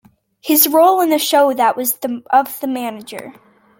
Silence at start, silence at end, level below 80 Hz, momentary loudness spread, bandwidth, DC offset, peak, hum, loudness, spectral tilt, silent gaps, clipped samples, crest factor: 0.45 s; 0.5 s; -68 dBFS; 19 LU; 17 kHz; under 0.1%; 0 dBFS; none; -14 LUFS; -2 dB/octave; none; under 0.1%; 16 dB